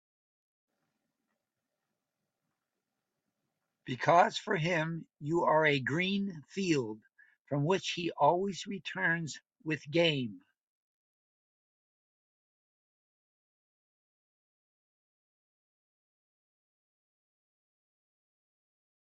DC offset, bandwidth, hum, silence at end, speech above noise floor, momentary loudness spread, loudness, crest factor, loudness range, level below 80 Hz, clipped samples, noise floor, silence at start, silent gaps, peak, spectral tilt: under 0.1%; 9 kHz; none; 8.75 s; 57 dB; 15 LU; -31 LUFS; 26 dB; 7 LU; -76 dBFS; under 0.1%; -88 dBFS; 3.85 s; 7.40-7.45 s; -10 dBFS; -5 dB/octave